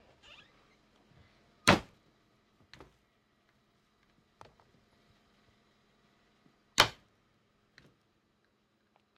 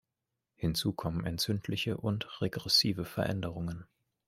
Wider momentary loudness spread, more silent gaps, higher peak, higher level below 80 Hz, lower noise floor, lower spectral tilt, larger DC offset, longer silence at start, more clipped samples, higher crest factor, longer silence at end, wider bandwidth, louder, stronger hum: first, 29 LU vs 11 LU; neither; first, -8 dBFS vs -12 dBFS; second, -62 dBFS vs -56 dBFS; second, -74 dBFS vs -87 dBFS; second, -3 dB/octave vs -4.5 dB/octave; neither; first, 1.65 s vs 0.6 s; neither; first, 32 dB vs 22 dB; first, 2.25 s vs 0.45 s; about the same, 15 kHz vs 16 kHz; first, -29 LUFS vs -32 LUFS; neither